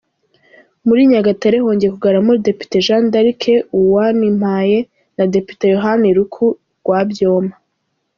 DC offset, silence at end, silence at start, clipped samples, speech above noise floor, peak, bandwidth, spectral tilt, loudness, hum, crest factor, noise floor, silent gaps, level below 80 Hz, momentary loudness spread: under 0.1%; 0.65 s; 0.85 s; under 0.1%; 56 dB; -2 dBFS; 7.2 kHz; -5.5 dB/octave; -14 LUFS; none; 12 dB; -69 dBFS; none; -54 dBFS; 6 LU